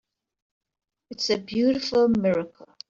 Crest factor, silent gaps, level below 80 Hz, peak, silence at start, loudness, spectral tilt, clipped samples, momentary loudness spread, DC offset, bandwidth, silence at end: 14 dB; none; -60 dBFS; -10 dBFS; 1.1 s; -23 LUFS; -5.5 dB/octave; under 0.1%; 13 LU; under 0.1%; 7.6 kHz; 0.4 s